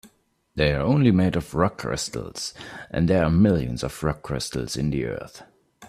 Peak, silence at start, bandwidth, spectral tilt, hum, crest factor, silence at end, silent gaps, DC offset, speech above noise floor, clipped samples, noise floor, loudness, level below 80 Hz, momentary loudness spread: -6 dBFS; 0.05 s; 14.5 kHz; -6 dB/octave; none; 18 dB; 0 s; none; under 0.1%; 40 dB; under 0.1%; -63 dBFS; -24 LUFS; -42 dBFS; 13 LU